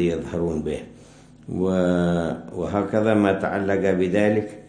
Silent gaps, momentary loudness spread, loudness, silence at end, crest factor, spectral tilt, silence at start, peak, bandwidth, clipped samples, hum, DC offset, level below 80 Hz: none; 9 LU; -22 LUFS; 0 s; 16 dB; -7.5 dB/octave; 0 s; -6 dBFS; 10 kHz; under 0.1%; none; under 0.1%; -48 dBFS